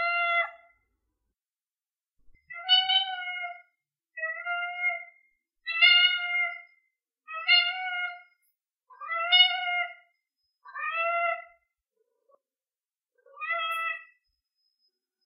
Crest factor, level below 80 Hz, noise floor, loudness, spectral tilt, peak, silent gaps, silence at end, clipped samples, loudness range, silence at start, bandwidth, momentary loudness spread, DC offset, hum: 22 dB; -82 dBFS; under -90 dBFS; -25 LUFS; 10 dB/octave; -8 dBFS; none; 1.2 s; under 0.1%; 10 LU; 0 s; 5.2 kHz; 19 LU; under 0.1%; none